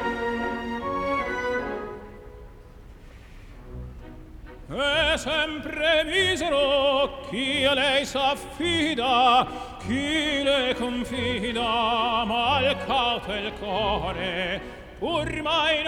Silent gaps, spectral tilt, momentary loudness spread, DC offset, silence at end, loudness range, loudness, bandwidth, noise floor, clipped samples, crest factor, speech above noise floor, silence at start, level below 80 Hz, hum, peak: none; -4 dB/octave; 13 LU; under 0.1%; 0 s; 9 LU; -24 LUFS; 17 kHz; -45 dBFS; under 0.1%; 16 dB; 21 dB; 0 s; -44 dBFS; none; -10 dBFS